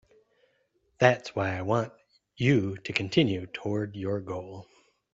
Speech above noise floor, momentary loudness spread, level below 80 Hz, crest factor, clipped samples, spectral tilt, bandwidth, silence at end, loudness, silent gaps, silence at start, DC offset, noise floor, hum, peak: 44 dB; 14 LU; -64 dBFS; 24 dB; under 0.1%; -6.5 dB/octave; 7.8 kHz; 0.5 s; -28 LUFS; none; 1 s; under 0.1%; -71 dBFS; none; -6 dBFS